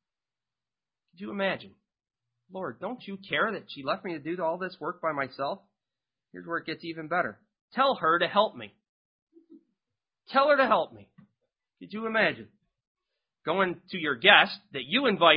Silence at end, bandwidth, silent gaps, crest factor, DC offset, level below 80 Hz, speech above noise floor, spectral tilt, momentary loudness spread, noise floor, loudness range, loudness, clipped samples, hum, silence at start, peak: 0 s; 5.4 kHz; 7.61-7.68 s, 8.89-9.27 s, 12.87-12.95 s; 26 dB; under 0.1%; -74 dBFS; over 63 dB; -8 dB/octave; 17 LU; under -90 dBFS; 8 LU; -27 LUFS; under 0.1%; none; 1.2 s; -2 dBFS